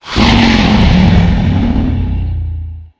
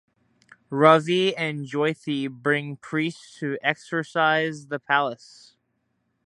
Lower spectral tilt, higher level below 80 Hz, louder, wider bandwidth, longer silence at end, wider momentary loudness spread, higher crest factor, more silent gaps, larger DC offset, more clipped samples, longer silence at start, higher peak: about the same, -6.5 dB/octave vs -5.5 dB/octave; first, -16 dBFS vs -74 dBFS; first, -11 LUFS vs -24 LUFS; second, 8 kHz vs 11.5 kHz; second, 0.15 s vs 1.15 s; about the same, 11 LU vs 13 LU; second, 10 dB vs 24 dB; neither; neither; first, 0.4% vs under 0.1%; second, 0.05 s vs 0.7 s; about the same, 0 dBFS vs 0 dBFS